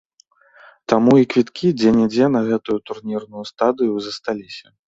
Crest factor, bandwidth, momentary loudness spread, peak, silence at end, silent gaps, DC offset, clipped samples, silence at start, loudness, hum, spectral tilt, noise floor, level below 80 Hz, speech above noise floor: 18 dB; 7.8 kHz; 14 LU; -2 dBFS; 0.25 s; none; under 0.1%; under 0.1%; 0.9 s; -18 LUFS; none; -7 dB/octave; -56 dBFS; -56 dBFS; 38 dB